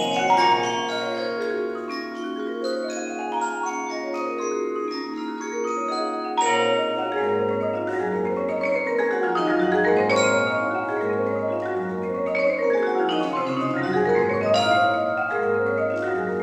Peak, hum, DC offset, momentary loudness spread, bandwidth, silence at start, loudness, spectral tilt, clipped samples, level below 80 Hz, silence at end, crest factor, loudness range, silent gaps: -8 dBFS; none; under 0.1%; 9 LU; 10.5 kHz; 0 s; -23 LUFS; -4.5 dB/octave; under 0.1%; -68 dBFS; 0 s; 16 dB; 6 LU; none